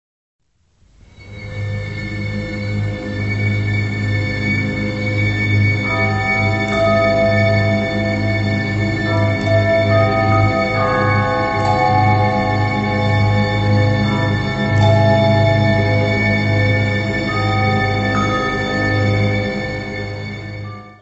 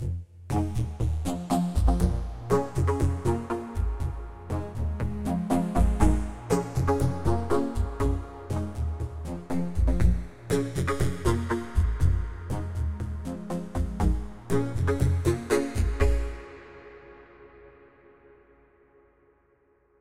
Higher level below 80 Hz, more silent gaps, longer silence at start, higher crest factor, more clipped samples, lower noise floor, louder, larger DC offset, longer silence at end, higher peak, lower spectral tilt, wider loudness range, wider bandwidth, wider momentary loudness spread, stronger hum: about the same, -36 dBFS vs -32 dBFS; neither; first, 1.2 s vs 0 s; second, 14 dB vs 20 dB; neither; second, -56 dBFS vs -65 dBFS; first, -16 LUFS vs -28 LUFS; neither; second, 0.1 s vs 2.3 s; first, -2 dBFS vs -6 dBFS; about the same, -7 dB/octave vs -7 dB/octave; about the same, 5 LU vs 3 LU; second, 8 kHz vs 14.5 kHz; about the same, 9 LU vs 9 LU; neither